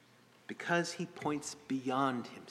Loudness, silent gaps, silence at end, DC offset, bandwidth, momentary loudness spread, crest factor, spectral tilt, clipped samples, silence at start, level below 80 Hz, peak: -36 LUFS; none; 0 s; under 0.1%; 14 kHz; 10 LU; 20 dB; -4.5 dB/octave; under 0.1%; 0.5 s; -78 dBFS; -18 dBFS